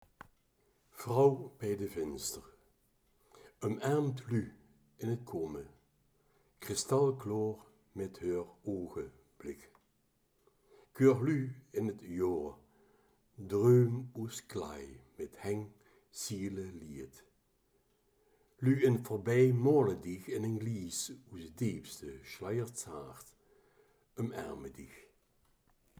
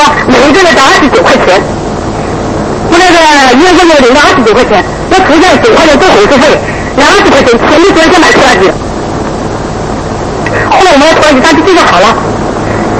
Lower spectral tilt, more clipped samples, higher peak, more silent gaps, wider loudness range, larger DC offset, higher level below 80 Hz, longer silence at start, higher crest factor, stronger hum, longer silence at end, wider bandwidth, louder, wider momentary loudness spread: first, -6.5 dB/octave vs -4 dB/octave; second, under 0.1% vs 5%; second, -14 dBFS vs 0 dBFS; neither; first, 11 LU vs 3 LU; neither; second, -68 dBFS vs -24 dBFS; first, 0.95 s vs 0 s; first, 22 dB vs 4 dB; neither; first, 1 s vs 0 s; first, over 20 kHz vs 11 kHz; second, -35 LUFS vs -4 LUFS; first, 21 LU vs 11 LU